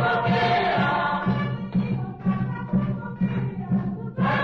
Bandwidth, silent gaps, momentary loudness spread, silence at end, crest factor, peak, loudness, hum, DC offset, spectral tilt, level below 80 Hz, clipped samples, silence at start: 6 kHz; none; 7 LU; 0 s; 12 dB; -12 dBFS; -25 LUFS; none; under 0.1%; -8.5 dB/octave; -48 dBFS; under 0.1%; 0 s